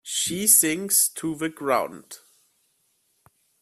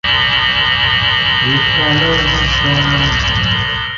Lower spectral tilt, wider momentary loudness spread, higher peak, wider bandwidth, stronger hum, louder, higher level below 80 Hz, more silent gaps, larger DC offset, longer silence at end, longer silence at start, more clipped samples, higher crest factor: second, -1.5 dB/octave vs -4 dB/octave; first, 14 LU vs 2 LU; about the same, -2 dBFS vs -2 dBFS; first, 16 kHz vs 7.4 kHz; neither; second, -20 LUFS vs -11 LUFS; second, -68 dBFS vs -28 dBFS; neither; neither; first, 1.45 s vs 0 s; about the same, 0.05 s vs 0.05 s; neither; first, 22 dB vs 12 dB